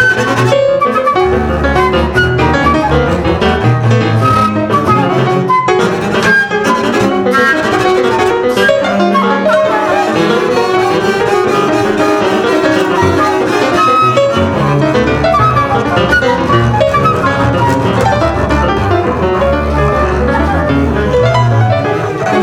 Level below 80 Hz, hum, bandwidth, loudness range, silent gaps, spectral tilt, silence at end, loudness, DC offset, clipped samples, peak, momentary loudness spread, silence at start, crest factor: -26 dBFS; none; 15 kHz; 1 LU; none; -6 dB/octave; 0 s; -10 LUFS; under 0.1%; under 0.1%; 0 dBFS; 2 LU; 0 s; 10 dB